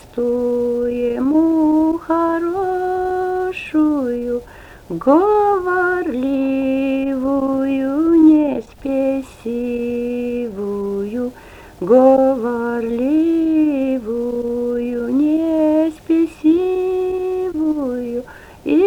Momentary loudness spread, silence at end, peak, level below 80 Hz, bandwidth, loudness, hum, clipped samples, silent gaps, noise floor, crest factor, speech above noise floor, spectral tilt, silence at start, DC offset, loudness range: 10 LU; 0 s; -2 dBFS; -46 dBFS; 9 kHz; -17 LUFS; none; under 0.1%; none; -39 dBFS; 16 dB; 25 dB; -7.5 dB/octave; 0.05 s; under 0.1%; 3 LU